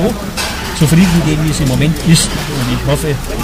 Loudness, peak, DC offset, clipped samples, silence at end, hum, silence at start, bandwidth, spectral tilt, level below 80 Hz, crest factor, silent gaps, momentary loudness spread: -13 LUFS; 0 dBFS; under 0.1%; under 0.1%; 0 s; none; 0 s; 16 kHz; -5 dB/octave; -24 dBFS; 12 dB; none; 8 LU